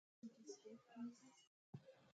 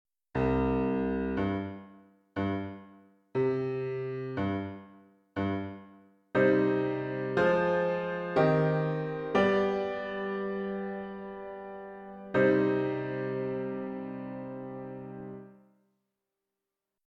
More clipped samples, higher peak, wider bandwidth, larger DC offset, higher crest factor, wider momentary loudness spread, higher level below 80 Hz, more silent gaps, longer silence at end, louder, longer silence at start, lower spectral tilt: neither; second, -42 dBFS vs -12 dBFS; first, 9 kHz vs 7 kHz; neither; about the same, 18 dB vs 20 dB; second, 8 LU vs 17 LU; second, under -90 dBFS vs -54 dBFS; first, 1.47-1.73 s vs none; second, 0.05 s vs 1.55 s; second, -59 LUFS vs -31 LUFS; about the same, 0.25 s vs 0.35 s; second, -5.5 dB/octave vs -8.5 dB/octave